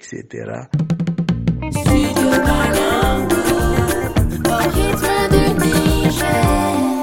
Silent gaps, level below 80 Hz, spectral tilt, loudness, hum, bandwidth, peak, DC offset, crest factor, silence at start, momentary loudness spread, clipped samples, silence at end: none; -26 dBFS; -5.5 dB/octave; -16 LUFS; none; 17 kHz; -2 dBFS; under 0.1%; 14 dB; 0.05 s; 6 LU; under 0.1%; 0 s